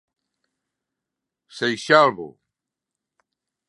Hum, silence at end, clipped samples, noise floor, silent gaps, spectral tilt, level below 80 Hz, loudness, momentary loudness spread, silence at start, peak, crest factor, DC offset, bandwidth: none; 1.4 s; under 0.1%; -85 dBFS; none; -4 dB/octave; -74 dBFS; -19 LUFS; 21 LU; 1.55 s; -2 dBFS; 24 dB; under 0.1%; 11.5 kHz